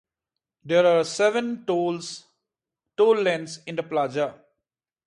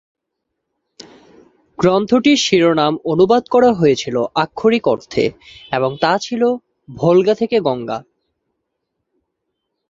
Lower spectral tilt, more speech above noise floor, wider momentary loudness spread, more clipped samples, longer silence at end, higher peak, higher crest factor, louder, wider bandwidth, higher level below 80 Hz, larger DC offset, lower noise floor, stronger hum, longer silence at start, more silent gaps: about the same, -4.5 dB/octave vs -5 dB/octave; about the same, 64 dB vs 62 dB; first, 13 LU vs 8 LU; neither; second, 0.75 s vs 1.9 s; second, -8 dBFS vs 0 dBFS; about the same, 18 dB vs 18 dB; second, -23 LUFS vs -16 LUFS; first, 11 kHz vs 7.8 kHz; second, -74 dBFS vs -54 dBFS; neither; first, -87 dBFS vs -77 dBFS; neither; second, 0.65 s vs 1.8 s; neither